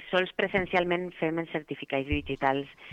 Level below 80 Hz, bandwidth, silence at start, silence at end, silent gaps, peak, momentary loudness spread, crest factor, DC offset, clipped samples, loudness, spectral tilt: -48 dBFS; 8.8 kHz; 0 s; 0 s; none; -12 dBFS; 7 LU; 18 dB; under 0.1%; under 0.1%; -29 LUFS; -7 dB/octave